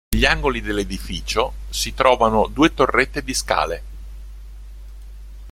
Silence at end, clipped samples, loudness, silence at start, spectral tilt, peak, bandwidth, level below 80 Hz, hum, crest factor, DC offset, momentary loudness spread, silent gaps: 0 s; under 0.1%; -19 LUFS; 0.1 s; -4 dB/octave; -2 dBFS; 16.5 kHz; -32 dBFS; none; 20 dB; under 0.1%; 24 LU; none